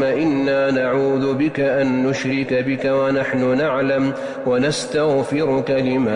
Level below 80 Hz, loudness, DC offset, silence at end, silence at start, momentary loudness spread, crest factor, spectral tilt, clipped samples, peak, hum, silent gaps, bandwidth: -52 dBFS; -19 LUFS; under 0.1%; 0 s; 0 s; 2 LU; 8 dB; -6 dB/octave; under 0.1%; -10 dBFS; none; none; 11 kHz